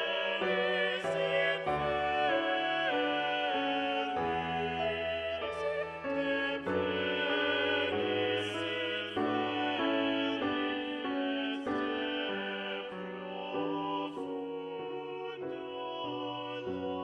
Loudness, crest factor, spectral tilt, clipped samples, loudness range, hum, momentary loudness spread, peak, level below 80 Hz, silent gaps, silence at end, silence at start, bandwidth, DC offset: -33 LUFS; 16 dB; -5.5 dB/octave; under 0.1%; 7 LU; none; 9 LU; -18 dBFS; -64 dBFS; none; 0 s; 0 s; 10.5 kHz; under 0.1%